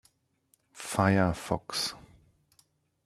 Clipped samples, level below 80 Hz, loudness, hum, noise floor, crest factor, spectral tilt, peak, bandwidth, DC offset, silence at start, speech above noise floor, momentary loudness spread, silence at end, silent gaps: under 0.1%; -58 dBFS; -29 LUFS; none; -71 dBFS; 24 dB; -5 dB/octave; -10 dBFS; 14.5 kHz; under 0.1%; 0.75 s; 44 dB; 15 LU; 1.05 s; none